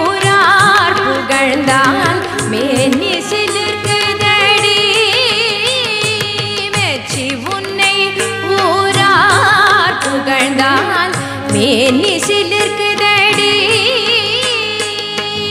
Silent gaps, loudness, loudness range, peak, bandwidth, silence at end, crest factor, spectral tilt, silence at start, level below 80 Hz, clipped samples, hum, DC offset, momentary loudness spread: none; -11 LUFS; 2 LU; 0 dBFS; 15.5 kHz; 0 s; 12 dB; -3 dB/octave; 0 s; -50 dBFS; under 0.1%; none; under 0.1%; 8 LU